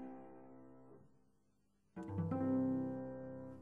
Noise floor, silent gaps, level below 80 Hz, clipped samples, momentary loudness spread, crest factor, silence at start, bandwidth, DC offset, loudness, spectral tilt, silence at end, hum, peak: -79 dBFS; none; -74 dBFS; under 0.1%; 23 LU; 16 dB; 0 s; 3.1 kHz; under 0.1%; -41 LUFS; -11 dB/octave; 0 s; none; -28 dBFS